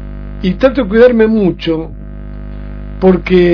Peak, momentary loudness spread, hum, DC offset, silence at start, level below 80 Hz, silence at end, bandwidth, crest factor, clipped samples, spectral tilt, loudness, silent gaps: 0 dBFS; 20 LU; 50 Hz at -25 dBFS; under 0.1%; 0 s; -26 dBFS; 0 s; 5.4 kHz; 12 dB; 1%; -9 dB/octave; -11 LUFS; none